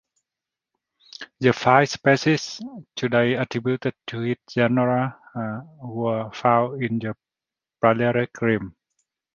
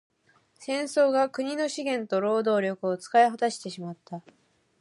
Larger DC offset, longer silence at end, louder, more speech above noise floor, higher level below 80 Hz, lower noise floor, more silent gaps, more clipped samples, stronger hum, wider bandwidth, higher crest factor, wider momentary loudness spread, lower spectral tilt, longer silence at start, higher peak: neither; about the same, 0.65 s vs 0.6 s; first, -22 LUFS vs -26 LUFS; first, 67 dB vs 39 dB; first, -60 dBFS vs -80 dBFS; first, -89 dBFS vs -65 dBFS; neither; neither; neither; second, 7.4 kHz vs 11.5 kHz; first, 22 dB vs 16 dB; about the same, 16 LU vs 17 LU; first, -6 dB/octave vs -4.5 dB/octave; first, 1.2 s vs 0.6 s; first, -2 dBFS vs -10 dBFS